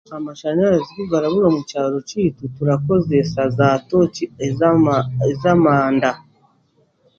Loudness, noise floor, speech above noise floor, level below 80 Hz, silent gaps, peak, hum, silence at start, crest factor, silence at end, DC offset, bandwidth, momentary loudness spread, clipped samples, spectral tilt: -18 LUFS; -60 dBFS; 43 dB; -50 dBFS; none; 0 dBFS; none; 0.1 s; 16 dB; 1 s; under 0.1%; 7.6 kHz; 7 LU; under 0.1%; -7.5 dB/octave